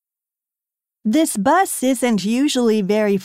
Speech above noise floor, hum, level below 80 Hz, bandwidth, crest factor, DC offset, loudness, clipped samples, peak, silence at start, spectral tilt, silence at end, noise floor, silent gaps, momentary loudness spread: 71 dB; none; -62 dBFS; 16 kHz; 14 dB; under 0.1%; -18 LUFS; under 0.1%; -6 dBFS; 1.05 s; -4.5 dB/octave; 0 s; -88 dBFS; none; 2 LU